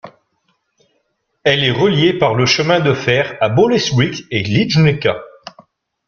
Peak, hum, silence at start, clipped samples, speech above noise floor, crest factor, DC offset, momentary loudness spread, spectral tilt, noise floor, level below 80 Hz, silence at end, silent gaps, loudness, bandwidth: 0 dBFS; none; 0.05 s; under 0.1%; 53 dB; 16 dB; under 0.1%; 6 LU; -5.5 dB/octave; -66 dBFS; -48 dBFS; 0.8 s; none; -14 LUFS; 7.2 kHz